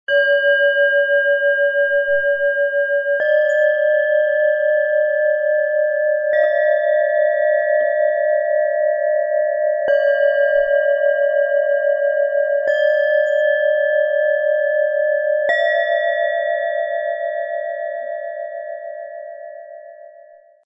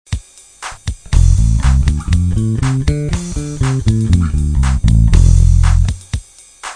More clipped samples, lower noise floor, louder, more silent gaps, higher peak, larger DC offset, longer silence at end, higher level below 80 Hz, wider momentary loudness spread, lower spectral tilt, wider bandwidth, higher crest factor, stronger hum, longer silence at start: neither; first, -46 dBFS vs -33 dBFS; second, -17 LUFS vs -14 LUFS; neither; second, -6 dBFS vs 0 dBFS; neither; first, 0.6 s vs 0 s; second, -64 dBFS vs -16 dBFS; second, 10 LU vs 15 LU; second, -1.5 dB/octave vs -6.5 dB/octave; second, 5.2 kHz vs 10 kHz; about the same, 12 dB vs 12 dB; neither; about the same, 0.1 s vs 0.1 s